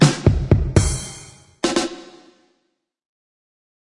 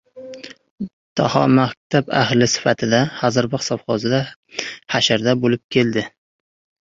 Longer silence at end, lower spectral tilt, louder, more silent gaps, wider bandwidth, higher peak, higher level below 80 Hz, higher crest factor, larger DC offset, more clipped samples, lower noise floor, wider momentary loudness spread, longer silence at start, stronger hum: first, 1.95 s vs 0.8 s; about the same, -5.5 dB/octave vs -5 dB/octave; about the same, -20 LUFS vs -18 LUFS; second, none vs 0.71-0.78 s, 0.93-1.16 s, 1.77-1.90 s, 4.36-4.43 s, 5.64-5.69 s; first, 11.5 kHz vs 7.8 kHz; about the same, 0 dBFS vs -2 dBFS; first, -32 dBFS vs -54 dBFS; about the same, 20 dB vs 18 dB; neither; neither; first, -72 dBFS vs -37 dBFS; about the same, 18 LU vs 17 LU; second, 0 s vs 0.15 s; neither